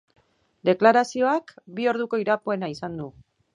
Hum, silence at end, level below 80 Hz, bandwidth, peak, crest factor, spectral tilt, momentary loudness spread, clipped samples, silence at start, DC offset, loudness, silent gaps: none; 0.45 s; -66 dBFS; 11 kHz; -2 dBFS; 22 dB; -5.5 dB/octave; 16 LU; under 0.1%; 0.65 s; under 0.1%; -23 LUFS; none